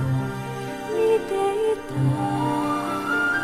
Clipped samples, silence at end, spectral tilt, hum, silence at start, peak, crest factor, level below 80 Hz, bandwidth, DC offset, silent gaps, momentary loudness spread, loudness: under 0.1%; 0 s; -6.5 dB/octave; none; 0 s; -10 dBFS; 12 dB; -52 dBFS; 15 kHz; under 0.1%; none; 8 LU; -24 LUFS